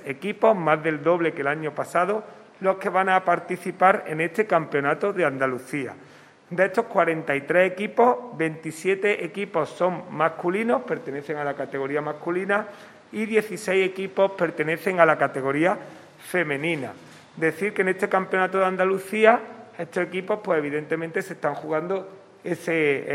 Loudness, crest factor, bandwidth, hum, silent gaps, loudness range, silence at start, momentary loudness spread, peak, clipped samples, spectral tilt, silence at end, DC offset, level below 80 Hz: -24 LUFS; 22 dB; 16 kHz; none; none; 4 LU; 0 s; 10 LU; -2 dBFS; under 0.1%; -6 dB/octave; 0 s; under 0.1%; -76 dBFS